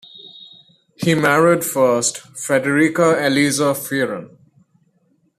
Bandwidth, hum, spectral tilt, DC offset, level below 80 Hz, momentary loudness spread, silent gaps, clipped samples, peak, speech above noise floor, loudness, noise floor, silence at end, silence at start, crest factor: 14.5 kHz; none; -4.5 dB/octave; under 0.1%; -60 dBFS; 15 LU; none; under 0.1%; -2 dBFS; 45 dB; -17 LUFS; -62 dBFS; 1.1 s; 0.15 s; 16 dB